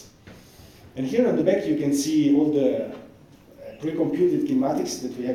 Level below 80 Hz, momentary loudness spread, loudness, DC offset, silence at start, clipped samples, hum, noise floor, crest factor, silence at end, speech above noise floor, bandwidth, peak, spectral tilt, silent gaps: -60 dBFS; 15 LU; -23 LUFS; under 0.1%; 0 s; under 0.1%; none; -50 dBFS; 16 dB; 0 s; 28 dB; 15 kHz; -8 dBFS; -6 dB/octave; none